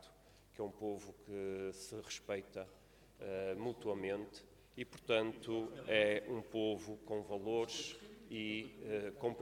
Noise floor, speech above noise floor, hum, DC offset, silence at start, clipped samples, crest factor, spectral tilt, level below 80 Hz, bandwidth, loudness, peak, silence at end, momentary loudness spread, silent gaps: -65 dBFS; 23 dB; none; under 0.1%; 0 s; under 0.1%; 24 dB; -4.5 dB/octave; -70 dBFS; 17.5 kHz; -42 LUFS; -18 dBFS; 0 s; 14 LU; none